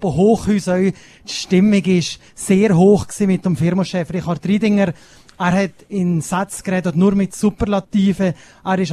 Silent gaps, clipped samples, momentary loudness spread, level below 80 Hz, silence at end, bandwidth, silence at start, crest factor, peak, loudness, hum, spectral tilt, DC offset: none; under 0.1%; 8 LU; -42 dBFS; 0 s; 13 kHz; 0 s; 16 dB; 0 dBFS; -17 LUFS; none; -6.5 dB/octave; under 0.1%